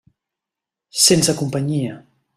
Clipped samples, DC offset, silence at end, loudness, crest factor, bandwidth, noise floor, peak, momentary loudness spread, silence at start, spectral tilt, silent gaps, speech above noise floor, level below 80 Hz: under 0.1%; under 0.1%; 0.35 s; -16 LUFS; 20 dB; 15 kHz; -86 dBFS; 0 dBFS; 15 LU; 0.95 s; -3.5 dB/octave; none; 68 dB; -56 dBFS